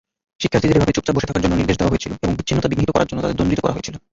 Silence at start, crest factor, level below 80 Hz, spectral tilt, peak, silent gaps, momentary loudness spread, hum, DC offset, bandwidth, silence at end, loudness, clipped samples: 0.4 s; 16 dB; -34 dBFS; -6 dB/octave; -2 dBFS; none; 6 LU; none; under 0.1%; 7.8 kHz; 0.15 s; -19 LUFS; under 0.1%